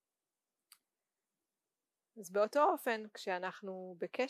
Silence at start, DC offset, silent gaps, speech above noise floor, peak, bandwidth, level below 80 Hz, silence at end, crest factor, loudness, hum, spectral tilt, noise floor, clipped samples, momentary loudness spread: 2.15 s; under 0.1%; none; over 54 dB; -18 dBFS; 16 kHz; under -90 dBFS; 0 s; 20 dB; -36 LUFS; none; -4 dB/octave; under -90 dBFS; under 0.1%; 15 LU